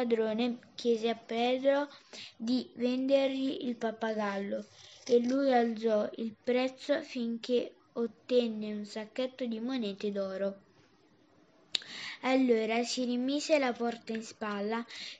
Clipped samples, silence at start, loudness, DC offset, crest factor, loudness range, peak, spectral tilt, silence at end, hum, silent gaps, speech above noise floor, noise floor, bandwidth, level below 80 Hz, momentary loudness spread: under 0.1%; 0 s; -32 LUFS; under 0.1%; 24 dB; 4 LU; -8 dBFS; -4.5 dB/octave; 0 s; none; none; 33 dB; -65 dBFS; 9.4 kHz; -88 dBFS; 10 LU